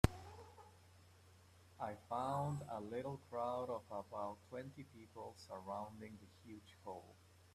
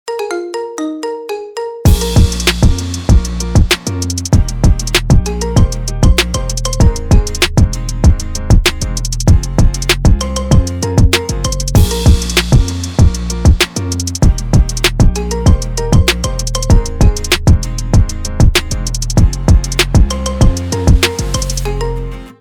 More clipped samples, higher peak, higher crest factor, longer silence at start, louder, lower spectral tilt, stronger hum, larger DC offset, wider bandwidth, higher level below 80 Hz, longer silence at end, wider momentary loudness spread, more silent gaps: second, under 0.1% vs 0.6%; second, -12 dBFS vs 0 dBFS; first, 36 dB vs 10 dB; about the same, 0.05 s vs 0.05 s; second, -47 LUFS vs -13 LUFS; first, -6.5 dB/octave vs -4.5 dB/octave; neither; neither; second, 14.5 kHz vs 19.5 kHz; second, -58 dBFS vs -14 dBFS; about the same, 0 s vs 0.1 s; first, 24 LU vs 8 LU; neither